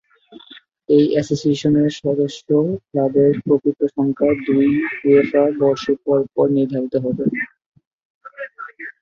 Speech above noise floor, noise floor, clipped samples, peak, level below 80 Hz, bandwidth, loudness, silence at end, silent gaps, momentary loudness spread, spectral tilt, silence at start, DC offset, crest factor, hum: 29 dB; -45 dBFS; under 0.1%; -2 dBFS; -56 dBFS; 7.6 kHz; -18 LUFS; 0.1 s; 7.66-7.72 s, 7.87-7.99 s, 8.05-8.21 s; 10 LU; -7.5 dB/octave; 0.3 s; under 0.1%; 16 dB; none